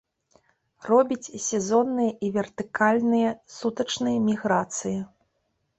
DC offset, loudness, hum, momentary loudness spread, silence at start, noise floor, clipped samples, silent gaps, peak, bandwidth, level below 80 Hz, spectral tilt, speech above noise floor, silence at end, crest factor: under 0.1%; -25 LUFS; none; 10 LU; 0.85 s; -74 dBFS; under 0.1%; none; -6 dBFS; 8.4 kHz; -66 dBFS; -4.5 dB/octave; 50 dB; 0.7 s; 18 dB